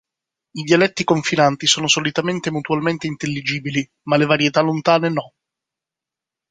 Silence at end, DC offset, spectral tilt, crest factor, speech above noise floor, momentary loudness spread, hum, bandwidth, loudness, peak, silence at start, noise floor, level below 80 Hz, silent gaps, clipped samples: 1.25 s; under 0.1%; -4 dB/octave; 18 dB; 69 dB; 9 LU; none; 9.6 kHz; -18 LUFS; -2 dBFS; 0.55 s; -87 dBFS; -60 dBFS; none; under 0.1%